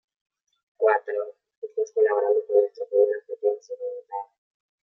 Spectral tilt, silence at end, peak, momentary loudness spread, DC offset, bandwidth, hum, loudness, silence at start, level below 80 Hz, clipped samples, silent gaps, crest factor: -3 dB/octave; 0.6 s; -8 dBFS; 15 LU; under 0.1%; 6.4 kHz; none; -25 LUFS; 0.8 s; under -90 dBFS; under 0.1%; 1.57-1.62 s; 18 dB